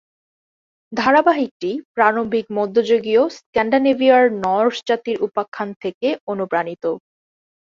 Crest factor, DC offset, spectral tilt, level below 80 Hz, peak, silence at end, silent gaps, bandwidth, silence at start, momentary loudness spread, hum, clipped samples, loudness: 18 dB; under 0.1%; -5.5 dB/octave; -60 dBFS; -2 dBFS; 0.65 s; 1.51-1.60 s, 1.85-1.94 s, 3.46-3.53 s, 5.48-5.52 s, 5.76-5.80 s, 5.94-6.01 s, 6.21-6.27 s; 7.4 kHz; 0.9 s; 12 LU; none; under 0.1%; -18 LUFS